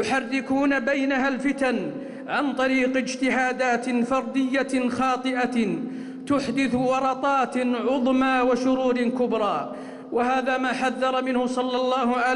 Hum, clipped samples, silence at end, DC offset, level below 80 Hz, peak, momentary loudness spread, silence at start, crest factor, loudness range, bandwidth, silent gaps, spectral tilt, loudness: none; under 0.1%; 0 s; under 0.1%; -58 dBFS; -14 dBFS; 5 LU; 0 s; 10 dB; 2 LU; 11 kHz; none; -4.5 dB/octave; -23 LUFS